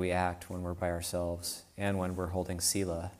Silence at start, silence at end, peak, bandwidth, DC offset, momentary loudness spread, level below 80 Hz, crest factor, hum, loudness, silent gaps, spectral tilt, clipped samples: 0 s; 0 s; -16 dBFS; 15.5 kHz; under 0.1%; 8 LU; -54 dBFS; 18 dB; none; -34 LUFS; none; -4 dB/octave; under 0.1%